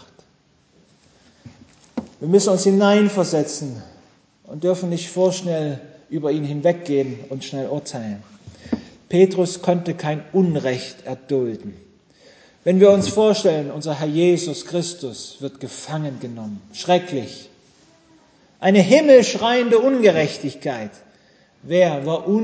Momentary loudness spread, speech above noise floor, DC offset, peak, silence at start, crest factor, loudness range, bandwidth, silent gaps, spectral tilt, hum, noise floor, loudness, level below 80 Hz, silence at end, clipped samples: 18 LU; 40 dB; under 0.1%; 0 dBFS; 1.45 s; 20 dB; 8 LU; 8 kHz; none; -5.5 dB/octave; none; -59 dBFS; -19 LUFS; -60 dBFS; 0 s; under 0.1%